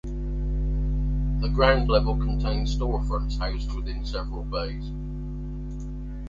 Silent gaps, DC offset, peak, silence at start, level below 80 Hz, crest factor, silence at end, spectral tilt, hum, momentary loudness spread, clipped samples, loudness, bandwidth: none; under 0.1%; -4 dBFS; 0.05 s; -28 dBFS; 20 dB; 0 s; -7 dB/octave; 50 Hz at -25 dBFS; 13 LU; under 0.1%; -28 LUFS; 7.4 kHz